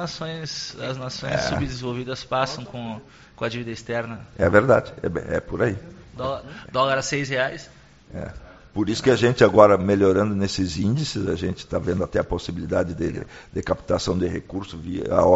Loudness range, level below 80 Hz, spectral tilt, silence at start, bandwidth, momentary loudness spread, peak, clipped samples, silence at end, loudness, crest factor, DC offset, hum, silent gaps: 8 LU; -44 dBFS; -5 dB/octave; 0 s; 8 kHz; 16 LU; 0 dBFS; under 0.1%; 0 s; -23 LUFS; 22 dB; under 0.1%; none; none